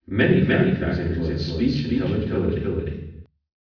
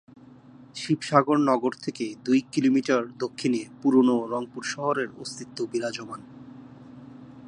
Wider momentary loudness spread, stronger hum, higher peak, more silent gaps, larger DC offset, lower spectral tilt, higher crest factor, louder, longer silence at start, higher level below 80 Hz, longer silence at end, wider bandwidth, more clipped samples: second, 11 LU vs 24 LU; neither; about the same, -6 dBFS vs -4 dBFS; neither; neither; first, -8.5 dB/octave vs -5.5 dB/octave; second, 16 dB vs 22 dB; first, -22 LUFS vs -25 LUFS; second, 0.1 s vs 0.6 s; first, -36 dBFS vs -72 dBFS; first, 0.4 s vs 0 s; second, 5.4 kHz vs 11 kHz; neither